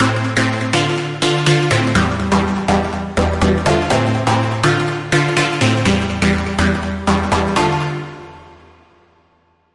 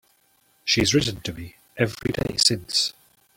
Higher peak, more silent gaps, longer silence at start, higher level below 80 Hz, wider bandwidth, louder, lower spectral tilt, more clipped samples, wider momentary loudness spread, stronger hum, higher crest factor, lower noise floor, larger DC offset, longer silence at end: about the same, -2 dBFS vs -2 dBFS; neither; second, 0 s vs 0.65 s; first, -36 dBFS vs -48 dBFS; second, 11.5 kHz vs 17 kHz; first, -16 LUFS vs -22 LUFS; first, -5 dB/octave vs -3 dB/octave; neither; second, 4 LU vs 14 LU; neither; second, 14 dB vs 22 dB; second, -57 dBFS vs -63 dBFS; neither; first, 1.2 s vs 0.45 s